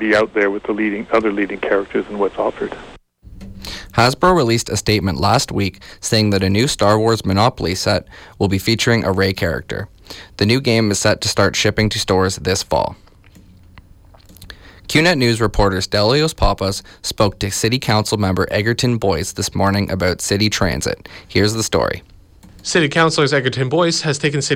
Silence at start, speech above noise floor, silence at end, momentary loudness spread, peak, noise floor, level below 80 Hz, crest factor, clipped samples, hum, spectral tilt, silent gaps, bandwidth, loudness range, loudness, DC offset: 0 s; 28 dB; 0 s; 9 LU; -4 dBFS; -45 dBFS; -36 dBFS; 14 dB; under 0.1%; none; -4.5 dB/octave; none; 16.5 kHz; 3 LU; -17 LUFS; under 0.1%